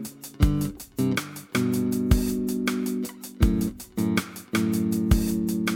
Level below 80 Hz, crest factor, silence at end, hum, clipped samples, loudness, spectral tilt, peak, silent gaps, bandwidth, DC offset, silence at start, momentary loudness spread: -32 dBFS; 20 dB; 0 s; none; under 0.1%; -26 LUFS; -6 dB/octave; -6 dBFS; none; 18.5 kHz; under 0.1%; 0 s; 6 LU